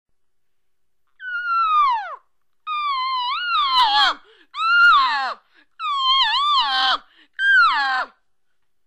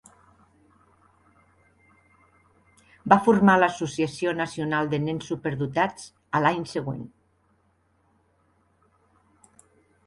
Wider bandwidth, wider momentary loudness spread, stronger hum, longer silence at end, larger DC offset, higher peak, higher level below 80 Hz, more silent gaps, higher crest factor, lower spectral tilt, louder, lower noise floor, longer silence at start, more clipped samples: about the same, 12.5 kHz vs 11.5 kHz; about the same, 16 LU vs 16 LU; neither; second, 0.8 s vs 3 s; neither; second, -6 dBFS vs -2 dBFS; about the same, -60 dBFS vs -62 dBFS; neither; second, 14 dB vs 26 dB; second, 1.5 dB/octave vs -6 dB/octave; first, -18 LUFS vs -24 LUFS; first, -77 dBFS vs -67 dBFS; second, 1.2 s vs 3.05 s; neither